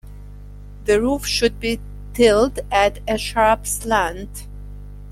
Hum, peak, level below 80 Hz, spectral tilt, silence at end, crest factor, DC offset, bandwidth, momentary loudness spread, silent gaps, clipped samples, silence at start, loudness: 50 Hz at -35 dBFS; -2 dBFS; -34 dBFS; -3.5 dB/octave; 0 s; 18 dB; under 0.1%; 16.5 kHz; 22 LU; none; under 0.1%; 0.05 s; -19 LUFS